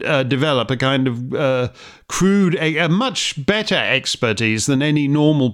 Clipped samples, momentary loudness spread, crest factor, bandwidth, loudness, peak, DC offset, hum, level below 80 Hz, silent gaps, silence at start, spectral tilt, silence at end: under 0.1%; 4 LU; 16 dB; 15.5 kHz; -17 LUFS; -2 dBFS; under 0.1%; none; -50 dBFS; none; 0 s; -5 dB/octave; 0 s